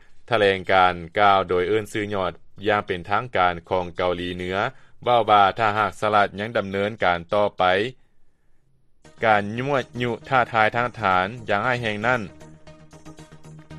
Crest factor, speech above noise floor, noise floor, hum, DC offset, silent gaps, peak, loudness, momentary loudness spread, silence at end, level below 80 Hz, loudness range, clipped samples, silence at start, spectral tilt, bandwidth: 20 dB; 34 dB; -55 dBFS; none; under 0.1%; none; -2 dBFS; -22 LUFS; 9 LU; 0 s; -54 dBFS; 3 LU; under 0.1%; 0.1 s; -5.5 dB/octave; 12.5 kHz